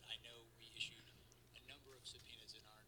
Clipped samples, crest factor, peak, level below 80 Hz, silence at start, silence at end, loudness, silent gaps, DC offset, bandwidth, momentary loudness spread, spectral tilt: under 0.1%; 26 dB; -32 dBFS; -76 dBFS; 0 s; 0 s; -54 LUFS; none; under 0.1%; 19 kHz; 15 LU; -1.5 dB/octave